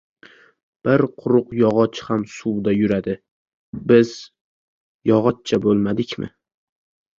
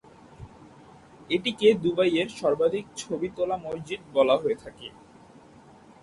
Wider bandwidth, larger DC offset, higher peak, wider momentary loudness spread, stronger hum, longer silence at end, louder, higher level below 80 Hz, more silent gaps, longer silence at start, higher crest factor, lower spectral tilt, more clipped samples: second, 7.6 kHz vs 11.5 kHz; neither; first, -2 dBFS vs -8 dBFS; second, 14 LU vs 21 LU; neither; second, 0.9 s vs 1.15 s; first, -20 LUFS vs -26 LUFS; first, -54 dBFS vs -60 dBFS; first, 3.31-3.73 s, 4.41-5.00 s vs none; first, 0.85 s vs 0.4 s; about the same, 20 dB vs 20 dB; first, -7 dB/octave vs -5 dB/octave; neither